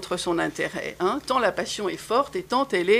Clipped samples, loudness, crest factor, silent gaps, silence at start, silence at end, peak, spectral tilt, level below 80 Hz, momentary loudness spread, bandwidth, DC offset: under 0.1%; -25 LUFS; 18 dB; none; 0 s; 0 s; -6 dBFS; -4 dB/octave; -56 dBFS; 5 LU; 15.5 kHz; under 0.1%